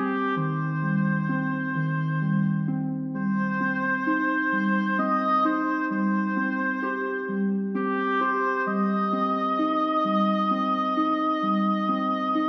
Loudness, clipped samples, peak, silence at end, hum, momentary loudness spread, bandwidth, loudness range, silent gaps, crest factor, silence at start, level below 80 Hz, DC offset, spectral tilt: -25 LUFS; under 0.1%; -12 dBFS; 0 s; none; 4 LU; 6.2 kHz; 2 LU; none; 12 dB; 0 s; -72 dBFS; under 0.1%; -8.5 dB/octave